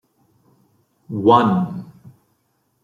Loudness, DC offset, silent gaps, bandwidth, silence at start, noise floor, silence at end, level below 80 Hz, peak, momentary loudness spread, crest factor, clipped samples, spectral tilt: -17 LUFS; under 0.1%; none; 7.6 kHz; 1.1 s; -67 dBFS; 0.95 s; -64 dBFS; -2 dBFS; 17 LU; 20 dB; under 0.1%; -8.5 dB/octave